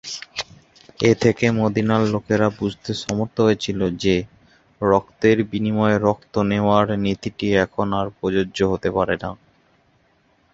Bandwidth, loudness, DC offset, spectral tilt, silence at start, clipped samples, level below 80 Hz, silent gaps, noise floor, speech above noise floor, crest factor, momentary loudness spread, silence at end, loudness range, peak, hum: 7.8 kHz; -20 LUFS; under 0.1%; -6 dB/octave; 0.05 s; under 0.1%; -46 dBFS; none; -60 dBFS; 41 dB; 18 dB; 9 LU; 1.2 s; 2 LU; -2 dBFS; none